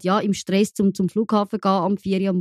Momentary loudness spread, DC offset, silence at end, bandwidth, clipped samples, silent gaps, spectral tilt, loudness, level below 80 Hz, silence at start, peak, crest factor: 2 LU; under 0.1%; 0 s; 13.5 kHz; under 0.1%; none; -6.5 dB/octave; -21 LUFS; -60 dBFS; 0 s; -6 dBFS; 14 dB